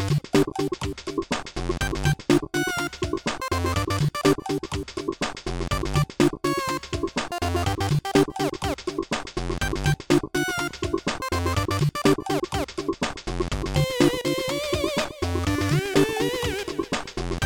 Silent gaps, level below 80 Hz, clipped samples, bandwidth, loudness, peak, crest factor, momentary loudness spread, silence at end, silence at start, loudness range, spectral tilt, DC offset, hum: none; -38 dBFS; under 0.1%; 19 kHz; -25 LUFS; -4 dBFS; 20 dB; 7 LU; 0 s; 0 s; 2 LU; -5 dB/octave; under 0.1%; none